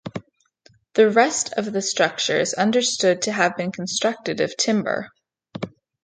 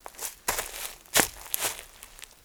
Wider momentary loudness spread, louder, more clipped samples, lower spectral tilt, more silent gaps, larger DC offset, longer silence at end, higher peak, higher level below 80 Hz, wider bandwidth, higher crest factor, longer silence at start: second, 16 LU vs 21 LU; first, -21 LUFS vs -28 LUFS; neither; first, -3 dB/octave vs -0.5 dB/octave; neither; neither; first, 0.35 s vs 0.15 s; about the same, -2 dBFS vs 0 dBFS; second, -66 dBFS vs -54 dBFS; second, 9.6 kHz vs over 20 kHz; second, 20 dB vs 32 dB; about the same, 0.05 s vs 0.05 s